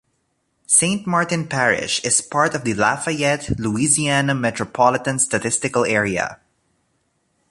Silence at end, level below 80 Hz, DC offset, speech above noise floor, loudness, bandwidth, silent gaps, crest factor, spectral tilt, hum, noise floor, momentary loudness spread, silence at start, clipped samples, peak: 1.15 s; -48 dBFS; under 0.1%; 50 dB; -18 LUFS; 11.5 kHz; none; 20 dB; -3 dB/octave; none; -69 dBFS; 6 LU; 0.7 s; under 0.1%; -2 dBFS